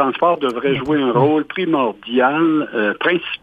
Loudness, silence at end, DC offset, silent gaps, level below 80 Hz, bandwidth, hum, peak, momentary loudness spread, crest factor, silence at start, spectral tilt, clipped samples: -17 LUFS; 0.05 s; under 0.1%; none; -56 dBFS; 5 kHz; none; -2 dBFS; 4 LU; 14 dB; 0 s; -7.5 dB/octave; under 0.1%